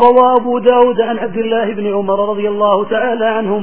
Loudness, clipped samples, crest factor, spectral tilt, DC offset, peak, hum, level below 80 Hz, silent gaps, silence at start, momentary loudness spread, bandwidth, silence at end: -13 LUFS; 0.2%; 12 dB; -9.5 dB/octave; 2%; 0 dBFS; none; -52 dBFS; none; 0 s; 7 LU; 4 kHz; 0 s